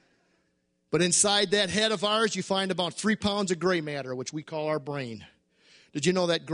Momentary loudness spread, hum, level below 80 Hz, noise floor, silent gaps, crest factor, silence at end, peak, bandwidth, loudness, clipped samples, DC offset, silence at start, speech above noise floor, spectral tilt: 13 LU; none; -62 dBFS; -73 dBFS; none; 20 dB; 0 s; -8 dBFS; 10.5 kHz; -26 LUFS; under 0.1%; under 0.1%; 0.9 s; 46 dB; -3 dB/octave